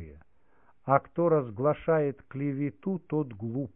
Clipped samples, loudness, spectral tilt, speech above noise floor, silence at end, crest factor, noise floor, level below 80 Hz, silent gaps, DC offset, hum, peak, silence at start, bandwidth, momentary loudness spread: under 0.1%; -29 LUFS; -12.5 dB/octave; 38 dB; 0.05 s; 22 dB; -66 dBFS; -60 dBFS; none; 0.1%; none; -6 dBFS; 0 s; 3.6 kHz; 9 LU